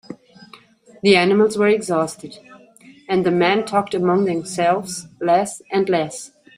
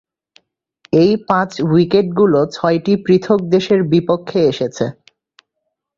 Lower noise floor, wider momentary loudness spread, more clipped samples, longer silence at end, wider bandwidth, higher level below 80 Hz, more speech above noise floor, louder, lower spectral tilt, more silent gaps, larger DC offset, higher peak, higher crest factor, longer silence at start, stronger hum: second, -47 dBFS vs -75 dBFS; first, 15 LU vs 5 LU; neither; second, 0.3 s vs 1.05 s; first, 15 kHz vs 7.6 kHz; second, -62 dBFS vs -54 dBFS; second, 29 dB vs 61 dB; second, -18 LUFS vs -15 LUFS; second, -5 dB/octave vs -7 dB/octave; neither; neither; about the same, -2 dBFS vs -2 dBFS; about the same, 18 dB vs 14 dB; second, 0.1 s vs 0.95 s; neither